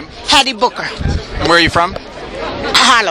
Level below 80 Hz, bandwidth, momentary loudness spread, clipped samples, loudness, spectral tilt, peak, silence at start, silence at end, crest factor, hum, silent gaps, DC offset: -28 dBFS; over 20 kHz; 14 LU; 0.3%; -12 LUFS; -3 dB/octave; 0 dBFS; 0 s; 0 s; 14 dB; none; none; under 0.1%